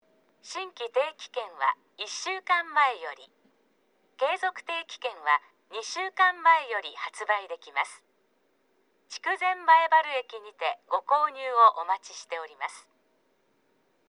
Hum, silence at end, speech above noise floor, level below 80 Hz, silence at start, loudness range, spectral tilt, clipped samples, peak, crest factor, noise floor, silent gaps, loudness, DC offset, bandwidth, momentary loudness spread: none; 1.3 s; 43 dB; under -90 dBFS; 0.45 s; 5 LU; 1.5 dB/octave; under 0.1%; -8 dBFS; 22 dB; -70 dBFS; none; -27 LUFS; under 0.1%; 11 kHz; 16 LU